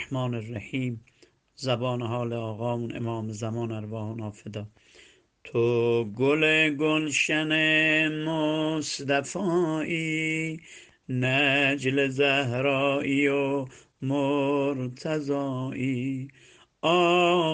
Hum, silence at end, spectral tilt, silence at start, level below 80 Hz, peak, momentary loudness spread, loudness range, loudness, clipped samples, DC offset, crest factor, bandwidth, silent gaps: none; 0 s; -5 dB/octave; 0 s; -68 dBFS; -8 dBFS; 13 LU; 8 LU; -26 LUFS; under 0.1%; under 0.1%; 18 dB; 9.8 kHz; none